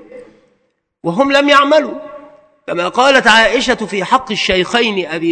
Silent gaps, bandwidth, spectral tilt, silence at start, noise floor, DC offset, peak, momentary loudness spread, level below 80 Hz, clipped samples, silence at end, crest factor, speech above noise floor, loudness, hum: none; 11 kHz; -3.5 dB/octave; 0.15 s; -63 dBFS; under 0.1%; 0 dBFS; 16 LU; -44 dBFS; 0.4%; 0 s; 14 dB; 51 dB; -12 LUFS; none